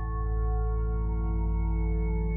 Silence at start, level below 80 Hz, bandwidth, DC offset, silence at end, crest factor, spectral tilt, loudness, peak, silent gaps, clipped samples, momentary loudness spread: 0 s; -28 dBFS; 2.3 kHz; under 0.1%; 0 s; 8 dB; -12.5 dB/octave; -30 LUFS; -18 dBFS; none; under 0.1%; 1 LU